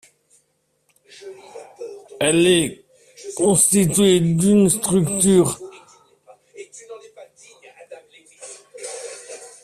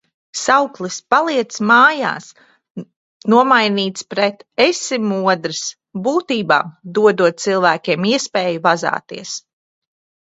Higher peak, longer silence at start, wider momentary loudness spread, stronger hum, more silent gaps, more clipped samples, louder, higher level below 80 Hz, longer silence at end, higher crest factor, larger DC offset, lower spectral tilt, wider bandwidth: second, -4 dBFS vs 0 dBFS; first, 1.2 s vs 0.35 s; first, 25 LU vs 15 LU; neither; second, none vs 2.71-2.75 s, 2.96-3.20 s; neither; about the same, -16 LUFS vs -16 LUFS; first, -54 dBFS vs -66 dBFS; second, 0.15 s vs 0.9 s; about the same, 18 dB vs 18 dB; neither; about the same, -4.5 dB/octave vs -3.5 dB/octave; first, 15.5 kHz vs 8.2 kHz